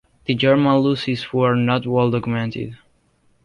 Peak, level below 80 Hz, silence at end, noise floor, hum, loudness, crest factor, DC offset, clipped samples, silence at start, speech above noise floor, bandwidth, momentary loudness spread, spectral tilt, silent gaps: -4 dBFS; -54 dBFS; 0.7 s; -60 dBFS; none; -19 LUFS; 14 dB; under 0.1%; under 0.1%; 0.3 s; 42 dB; 10.5 kHz; 10 LU; -8 dB/octave; none